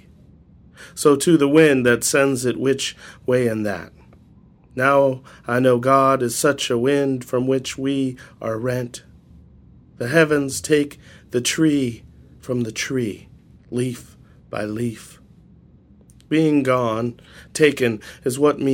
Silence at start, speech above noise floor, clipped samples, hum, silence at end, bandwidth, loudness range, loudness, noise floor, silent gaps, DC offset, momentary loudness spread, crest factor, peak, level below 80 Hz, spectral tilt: 0.8 s; 31 dB; under 0.1%; none; 0 s; 17 kHz; 9 LU; -20 LUFS; -50 dBFS; none; under 0.1%; 15 LU; 20 dB; -2 dBFS; -54 dBFS; -5 dB/octave